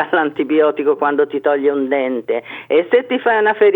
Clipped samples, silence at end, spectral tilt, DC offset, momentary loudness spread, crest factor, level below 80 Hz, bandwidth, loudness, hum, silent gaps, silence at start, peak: under 0.1%; 0 s; -7.5 dB/octave; under 0.1%; 5 LU; 14 dB; -74 dBFS; 4 kHz; -16 LUFS; none; none; 0 s; 0 dBFS